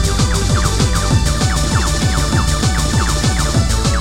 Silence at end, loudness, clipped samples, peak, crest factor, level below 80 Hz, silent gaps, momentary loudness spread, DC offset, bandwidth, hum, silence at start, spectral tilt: 0 s; -15 LUFS; under 0.1%; 0 dBFS; 14 dB; -18 dBFS; none; 1 LU; 2%; 16.5 kHz; none; 0 s; -4 dB/octave